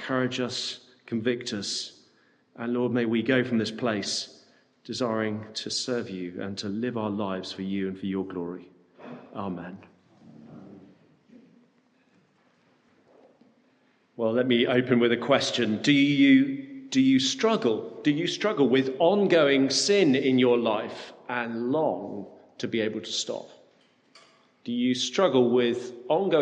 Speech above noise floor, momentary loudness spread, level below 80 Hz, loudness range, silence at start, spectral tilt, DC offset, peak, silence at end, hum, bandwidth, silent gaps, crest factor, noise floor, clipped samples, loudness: 40 dB; 16 LU; -76 dBFS; 13 LU; 0 s; -4.5 dB/octave; under 0.1%; -8 dBFS; 0 s; none; 9.8 kHz; none; 20 dB; -65 dBFS; under 0.1%; -25 LUFS